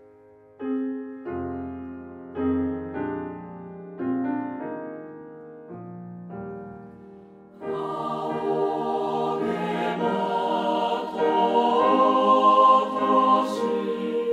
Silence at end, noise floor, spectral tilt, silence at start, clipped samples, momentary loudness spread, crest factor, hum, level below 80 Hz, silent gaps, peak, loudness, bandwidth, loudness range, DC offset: 0 s; -52 dBFS; -6.5 dB/octave; 0.6 s; under 0.1%; 21 LU; 18 dB; none; -62 dBFS; none; -6 dBFS; -24 LUFS; 11.5 kHz; 15 LU; under 0.1%